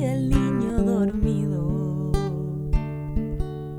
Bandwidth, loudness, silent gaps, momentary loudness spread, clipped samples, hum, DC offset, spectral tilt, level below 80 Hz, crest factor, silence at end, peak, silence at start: 12.5 kHz; -25 LUFS; none; 7 LU; under 0.1%; none; under 0.1%; -8.5 dB/octave; -30 dBFS; 18 dB; 0 s; -6 dBFS; 0 s